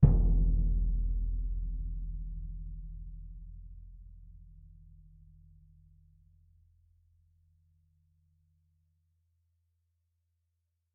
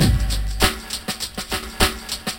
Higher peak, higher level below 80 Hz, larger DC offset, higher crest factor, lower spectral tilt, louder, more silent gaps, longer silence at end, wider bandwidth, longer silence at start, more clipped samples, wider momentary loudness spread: second, -8 dBFS vs 0 dBFS; second, -36 dBFS vs -26 dBFS; neither; first, 26 dB vs 20 dB; first, -13 dB/octave vs -3.5 dB/octave; second, -35 LUFS vs -22 LUFS; neither; first, 6.5 s vs 0 s; second, 1.2 kHz vs 17 kHz; about the same, 0 s vs 0 s; neither; first, 26 LU vs 7 LU